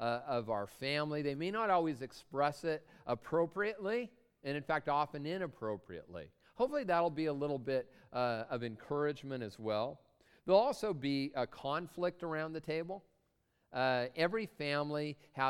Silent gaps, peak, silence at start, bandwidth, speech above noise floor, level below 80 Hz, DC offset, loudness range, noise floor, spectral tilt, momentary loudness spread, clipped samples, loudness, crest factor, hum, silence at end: none; -16 dBFS; 0 s; 15.5 kHz; 42 dB; -70 dBFS; under 0.1%; 2 LU; -78 dBFS; -6 dB/octave; 10 LU; under 0.1%; -37 LUFS; 22 dB; none; 0 s